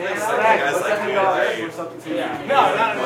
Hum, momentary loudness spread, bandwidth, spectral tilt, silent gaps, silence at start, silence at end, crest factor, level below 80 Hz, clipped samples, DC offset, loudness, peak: none; 10 LU; 16.5 kHz; -3.5 dB/octave; none; 0 s; 0 s; 18 dB; -68 dBFS; under 0.1%; under 0.1%; -19 LUFS; -2 dBFS